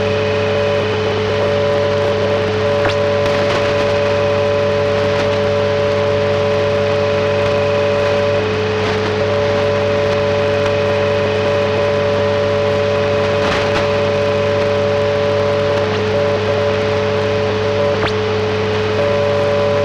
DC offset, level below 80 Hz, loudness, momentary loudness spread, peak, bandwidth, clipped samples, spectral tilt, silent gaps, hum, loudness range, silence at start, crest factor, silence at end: under 0.1%; -42 dBFS; -15 LUFS; 1 LU; -4 dBFS; 9.6 kHz; under 0.1%; -6 dB/octave; none; none; 1 LU; 0 s; 10 dB; 0 s